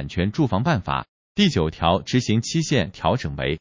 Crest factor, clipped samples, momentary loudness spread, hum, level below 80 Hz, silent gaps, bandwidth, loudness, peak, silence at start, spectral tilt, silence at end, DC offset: 18 dB; under 0.1%; 6 LU; none; -38 dBFS; 1.08-1.35 s; 7.6 kHz; -22 LUFS; -4 dBFS; 0 s; -5.5 dB/octave; 0 s; under 0.1%